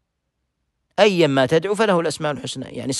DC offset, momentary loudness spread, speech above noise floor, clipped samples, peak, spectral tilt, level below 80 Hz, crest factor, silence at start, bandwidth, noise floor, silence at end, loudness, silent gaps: under 0.1%; 13 LU; 56 dB; under 0.1%; -2 dBFS; -4.5 dB/octave; -60 dBFS; 18 dB; 1 s; 12.5 kHz; -75 dBFS; 0 s; -19 LUFS; none